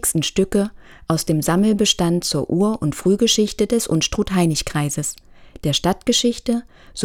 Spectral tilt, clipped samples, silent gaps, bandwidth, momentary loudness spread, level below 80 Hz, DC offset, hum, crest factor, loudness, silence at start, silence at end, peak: -4.5 dB/octave; under 0.1%; none; 17.5 kHz; 9 LU; -40 dBFS; under 0.1%; none; 18 dB; -19 LUFS; 0.05 s; 0 s; 0 dBFS